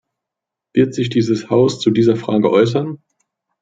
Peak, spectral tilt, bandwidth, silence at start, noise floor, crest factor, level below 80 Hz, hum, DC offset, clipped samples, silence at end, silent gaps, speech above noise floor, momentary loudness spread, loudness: -2 dBFS; -7 dB/octave; 7.8 kHz; 0.75 s; -83 dBFS; 14 dB; -58 dBFS; none; under 0.1%; under 0.1%; 0.65 s; none; 69 dB; 7 LU; -16 LUFS